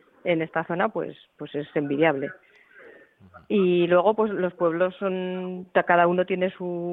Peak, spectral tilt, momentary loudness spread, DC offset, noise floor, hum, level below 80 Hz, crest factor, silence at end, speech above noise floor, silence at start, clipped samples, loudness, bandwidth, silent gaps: -6 dBFS; -9.5 dB/octave; 13 LU; under 0.1%; -50 dBFS; none; -68 dBFS; 18 dB; 0 s; 26 dB; 0.25 s; under 0.1%; -24 LUFS; 4 kHz; none